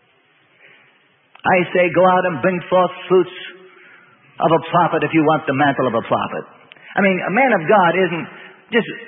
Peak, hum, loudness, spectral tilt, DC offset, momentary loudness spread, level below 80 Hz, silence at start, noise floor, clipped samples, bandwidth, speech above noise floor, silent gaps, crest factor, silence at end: -2 dBFS; none; -17 LUFS; -11.5 dB/octave; under 0.1%; 12 LU; -62 dBFS; 1.45 s; -57 dBFS; under 0.1%; 3.8 kHz; 41 dB; none; 16 dB; 0 s